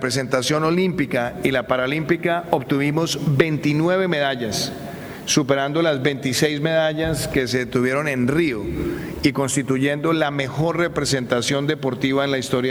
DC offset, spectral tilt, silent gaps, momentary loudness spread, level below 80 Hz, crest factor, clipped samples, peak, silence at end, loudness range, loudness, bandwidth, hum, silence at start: under 0.1%; -5 dB/octave; none; 4 LU; -46 dBFS; 20 dB; under 0.1%; 0 dBFS; 0 s; 1 LU; -21 LUFS; over 20 kHz; none; 0 s